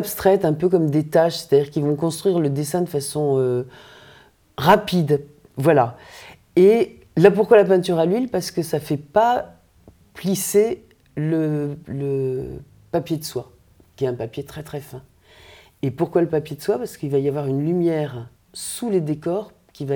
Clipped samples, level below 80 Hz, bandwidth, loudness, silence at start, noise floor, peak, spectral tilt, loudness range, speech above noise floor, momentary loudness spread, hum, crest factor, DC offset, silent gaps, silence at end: under 0.1%; -56 dBFS; over 20 kHz; -20 LUFS; 0 s; -52 dBFS; 0 dBFS; -6 dB/octave; 10 LU; 32 dB; 17 LU; none; 20 dB; under 0.1%; none; 0 s